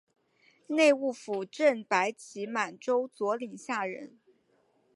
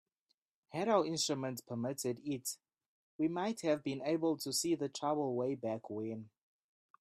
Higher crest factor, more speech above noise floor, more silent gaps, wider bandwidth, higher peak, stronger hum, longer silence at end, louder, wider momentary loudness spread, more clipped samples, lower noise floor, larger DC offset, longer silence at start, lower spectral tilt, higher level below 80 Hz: about the same, 20 dB vs 20 dB; second, 40 dB vs 47 dB; second, none vs 2.86-3.19 s; second, 11.5 kHz vs 15.5 kHz; first, -10 dBFS vs -18 dBFS; neither; about the same, 0.9 s vs 0.8 s; first, -30 LUFS vs -37 LUFS; first, 12 LU vs 9 LU; neither; second, -70 dBFS vs -84 dBFS; neither; about the same, 0.7 s vs 0.7 s; about the same, -3.5 dB/octave vs -4.5 dB/octave; second, -88 dBFS vs -80 dBFS